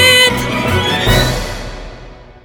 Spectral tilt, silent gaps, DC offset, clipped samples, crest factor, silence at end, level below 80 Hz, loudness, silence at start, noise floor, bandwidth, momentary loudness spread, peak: -3.5 dB/octave; none; under 0.1%; under 0.1%; 14 dB; 0.1 s; -26 dBFS; -12 LUFS; 0 s; -35 dBFS; over 20 kHz; 21 LU; 0 dBFS